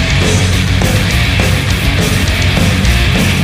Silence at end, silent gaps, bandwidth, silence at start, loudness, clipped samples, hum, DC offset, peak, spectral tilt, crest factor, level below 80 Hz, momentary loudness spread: 0 s; none; 16 kHz; 0 s; -11 LUFS; under 0.1%; none; under 0.1%; 0 dBFS; -4.5 dB/octave; 10 dB; -18 dBFS; 1 LU